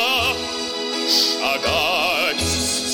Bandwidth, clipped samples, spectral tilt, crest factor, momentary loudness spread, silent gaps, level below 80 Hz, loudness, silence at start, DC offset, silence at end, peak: 19 kHz; under 0.1%; -1.5 dB/octave; 16 dB; 7 LU; none; -46 dBFS; -19 LUFS; 0 s; under 0.1%; 0 s; -6 dBFS